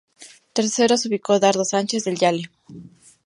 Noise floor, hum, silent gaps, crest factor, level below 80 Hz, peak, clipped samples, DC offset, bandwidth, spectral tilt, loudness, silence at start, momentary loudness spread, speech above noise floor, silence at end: -44 dBFS; none; none; 18 dB; -68 dBFS; -4 dBFS; under 0.1%; under 0.1%; 11.5 kHz; -3.5 dB/octave; -20 LUFS; 0.2 s; 9 LU; 24 dB; 0.35 s